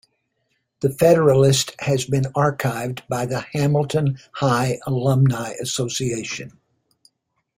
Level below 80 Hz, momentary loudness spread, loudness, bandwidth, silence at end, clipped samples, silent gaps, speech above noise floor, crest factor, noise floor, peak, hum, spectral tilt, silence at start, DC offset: -54 dBFS; 11 LU; -20 LUFS; 16 kHz; 1.1 s; under 0.1%; none; 52 dB; 18 dB; -71 dBFS; -2 dBFS; none; -5.5 dB/octave; 0.8 s; under 0.1%